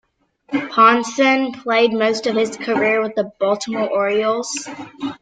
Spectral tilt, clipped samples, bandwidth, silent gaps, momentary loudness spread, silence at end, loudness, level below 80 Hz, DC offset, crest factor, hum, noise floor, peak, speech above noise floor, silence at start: -3.5 dB/octave; under 0.1%; 9.4 kHz; none; 12 LU; 0.05 s; -18 LUFS; -64 dBFS; under 0.1%; 16 dB; none; -54 dBFS; -2 dBFS; 36 dB; 0.5 s